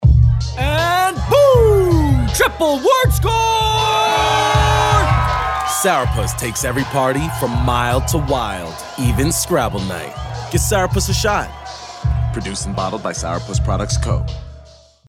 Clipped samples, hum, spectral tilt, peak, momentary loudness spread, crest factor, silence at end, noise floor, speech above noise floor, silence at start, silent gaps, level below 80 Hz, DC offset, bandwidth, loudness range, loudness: under 0.1%; none; -4.5 dB/octave; -2 dBFS; 9 LU; 14 dB; 0.45 s; -43 dBFS; 26 dB; 0 s; none; -24 dBFS; under 0.1%; 16.5 kHz; 6 LU; -16 LUFS